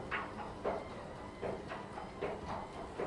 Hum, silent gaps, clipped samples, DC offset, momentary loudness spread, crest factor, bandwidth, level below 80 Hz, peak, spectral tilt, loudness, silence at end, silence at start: none; none; under 0.1%; under 0.1%; 6 LU; 18 dB; 11.5 kHz; -58 dBFS; -24 dBFS; -6 dB/octave; -43 LUFS; 0 s; 0 s